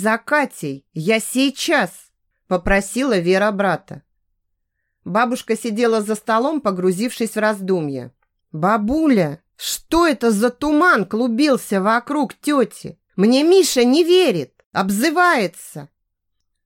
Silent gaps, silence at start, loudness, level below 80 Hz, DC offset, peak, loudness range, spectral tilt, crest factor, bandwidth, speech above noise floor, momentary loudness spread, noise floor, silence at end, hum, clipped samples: 14.66-14.71 s; 0 s; -18 LUFS; -44 dBFS; under 0.1%; -4 dBFS; 5 LU; -4.5 dB/octave; 16 dB; 17 kHz; 56 dB; 11 LU; -74 dBFS; 0.8 s; none; under 0.1%